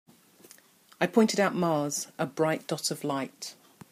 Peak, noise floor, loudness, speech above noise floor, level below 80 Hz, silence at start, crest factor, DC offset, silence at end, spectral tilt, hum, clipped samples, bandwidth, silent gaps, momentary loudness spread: -10 dBFS; -57 dBFS; -28 LUFS; 29 dB; -78 dBFS; 1 s; 20 dB; under 0.1%; 0.4 s; -4.5 dB/octave; none; under 0.1%; 15.5 kHz; none; 11 LU